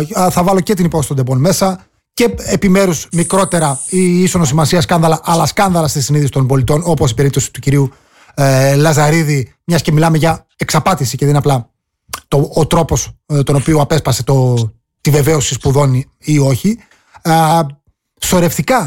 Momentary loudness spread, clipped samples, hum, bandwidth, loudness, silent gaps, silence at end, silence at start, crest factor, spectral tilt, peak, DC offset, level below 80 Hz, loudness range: 7 LU; under 0.1%; none; 17 kHz; -13 LUFS; none; 0 s; 0 s; 10 dB; -5.5 dB/octave; -2 dBFS; 0.6%; -34 dBFS; 2 LU